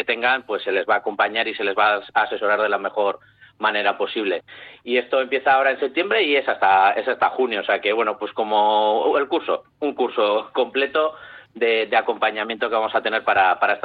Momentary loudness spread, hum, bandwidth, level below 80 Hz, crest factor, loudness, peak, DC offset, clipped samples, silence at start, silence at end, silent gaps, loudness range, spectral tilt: 7 LU; none; 4.9 kHz; -68 dBFS; 14 dB; -20 LUFS; -6 dBFS; under 0.1%; under 0.1%; 0 s; 0.05 s; none; 3 LU; -6.5 dB/octave